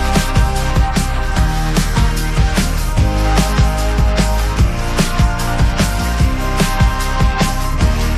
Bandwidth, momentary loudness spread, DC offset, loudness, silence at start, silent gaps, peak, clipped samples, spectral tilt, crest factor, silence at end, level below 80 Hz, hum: 15 kHz; 2 LU; under 0.1%; -16 LUFS; 0 s; none; 0 dBFS; under 0.1%; -5 dB/octave; 12 dB; 0 s; -16 dBFS; none